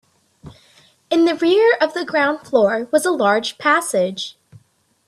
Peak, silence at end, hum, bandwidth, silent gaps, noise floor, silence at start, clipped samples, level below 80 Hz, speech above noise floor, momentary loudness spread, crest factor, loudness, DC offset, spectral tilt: -2 dBFS; 0.75 s; none; 13.5 kHz; none; -59 dBFS; 0.45 s; under 0.1%; -64 dBFS; 42 dB; 7 LU; 18 dB; -17 LUFS; under 0.1%; -3.5 dB/octave